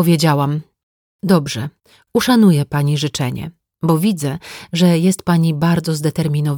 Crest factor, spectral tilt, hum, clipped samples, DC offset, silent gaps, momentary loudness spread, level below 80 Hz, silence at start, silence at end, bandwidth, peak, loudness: 14 dB; -6 dB/octave; none; under 0.1%; under 0.1%; 0.83-1.19 s; 13 LU; -50 dBFS; 0 s; 0 s; 19.5 kHz; -2 dBFS; -16 LUFS